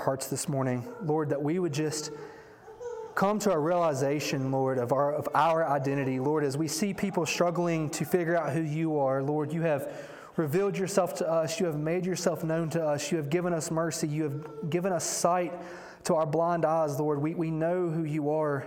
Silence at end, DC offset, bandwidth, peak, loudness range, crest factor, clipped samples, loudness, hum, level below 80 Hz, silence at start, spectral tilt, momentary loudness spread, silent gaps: 0 s; under 0.1%; 18 kHz; -10 dBFS; 2 LU; 18 dB; under 0.1%; -29 LUFS; none; -70 dBFS; 0 s; -5.5 dB/octave; 7 LU; none